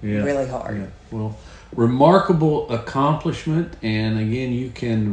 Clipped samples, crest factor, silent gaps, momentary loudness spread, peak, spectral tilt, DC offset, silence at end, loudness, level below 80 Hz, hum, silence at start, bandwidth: under 0.1%; 20 dB; none; 15 LU; 0 dBFS; -8 dB/octave; under 0.1%; 0 s; -21 LUFS; -44 dBFS; none; 0 s; 9.4 kHz